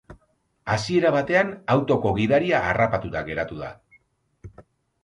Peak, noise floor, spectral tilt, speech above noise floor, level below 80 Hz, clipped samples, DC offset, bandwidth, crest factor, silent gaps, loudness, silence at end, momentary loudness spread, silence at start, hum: -6 dBFS; -66 dBFS; -6.5 dB/octave; 44 dB; -48 dBFS; under 0.1%; under 0.1%; 11.5 kHz; 18 dB; none; -22 LUFS; 0.45 s; 11 LU; 0.1 s; none